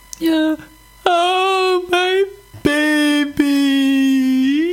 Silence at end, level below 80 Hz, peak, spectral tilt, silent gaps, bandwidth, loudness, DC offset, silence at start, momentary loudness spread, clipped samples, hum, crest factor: 0 s; -50 dBFS; 0 dBFS; -3.5 dB/octave; none; 16.5 kHz; -16 LUFS; under 0.1%; 0.2 s; 6 LU; under 0.1%; none; 16 dB